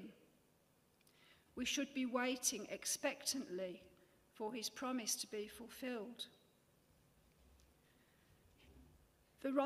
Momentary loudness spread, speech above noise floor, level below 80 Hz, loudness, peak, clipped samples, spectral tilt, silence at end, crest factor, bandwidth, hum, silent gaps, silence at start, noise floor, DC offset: 12 LU; 31 dB; -78 dBFS; -43 LUFS; -22 dBFS; under 0.1%; -1.5 dB/octave; 0 s; 24 dB; 15.5 kHz; none; none; 0 s; -75 dBFS; under 0.1%